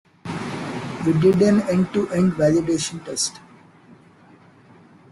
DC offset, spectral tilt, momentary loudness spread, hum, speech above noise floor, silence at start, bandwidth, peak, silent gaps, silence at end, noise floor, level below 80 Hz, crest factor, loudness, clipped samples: under 0.1%; -5.5 dB/octave; 13 LU; none; 31 dB; 0.25 s; 12 kHz; -4 dBFS; none; 1.2 s; -50 dBFS; -54 dBFS; 16 dB; -21 LUFS; under 0.1%